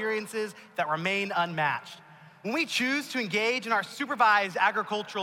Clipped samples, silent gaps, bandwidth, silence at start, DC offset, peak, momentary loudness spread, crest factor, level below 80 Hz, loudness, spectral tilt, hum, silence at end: under 0.1%; none; 16.5 kHz; 0 s; under 0.1%; -12 dBFS; 12 LU; 18 dB; -78 dBFS; -27 LUFS; -3.5 dB/octave; none; 0 s